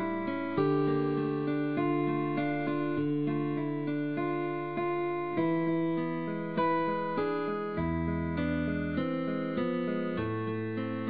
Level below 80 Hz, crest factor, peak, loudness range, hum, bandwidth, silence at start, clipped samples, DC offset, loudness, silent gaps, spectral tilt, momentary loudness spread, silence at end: -54 dBFS; 14 dB; -18 dBFS; 2 LU; none; 5 kHz; 0 s; under 0.1%; 0.2%; -31 LUFS; none; -6.5 dB/octave; 4 LU; 0 s